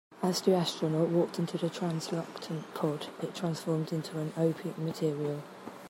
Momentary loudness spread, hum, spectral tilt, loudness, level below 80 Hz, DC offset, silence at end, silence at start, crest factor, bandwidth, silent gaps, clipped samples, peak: 10 LU; none; -6 dB/octave; -32 LUFS; -78 dBFS; under 0.1%; 0 s; 0.1 s; 18 dB; 16 kHz; none; under 0.1%; -14 dBFS